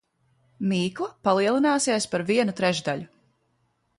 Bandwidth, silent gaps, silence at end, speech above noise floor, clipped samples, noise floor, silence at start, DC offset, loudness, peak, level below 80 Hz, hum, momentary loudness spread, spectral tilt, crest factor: 11.5 kHz; none; 0.9 s; 47 dB; under 0.1%; -70 dBFS; 0.6 s; under 0.1%; -24 LUFS; -8 dBFS; -66 dBFS; none; 8 LU; -4.5 dB/octave; 18 dB